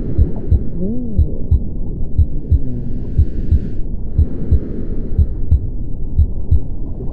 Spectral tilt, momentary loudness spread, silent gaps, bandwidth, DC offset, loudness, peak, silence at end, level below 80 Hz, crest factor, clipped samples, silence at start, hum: -12.5 dB/octave; 9 LU; none; 1.7 kHz; under 0.1%; -20 LUFS; 0 dBFS; 0 s; -18 dBFS; 14 dB; under 0.1%; 0 s; none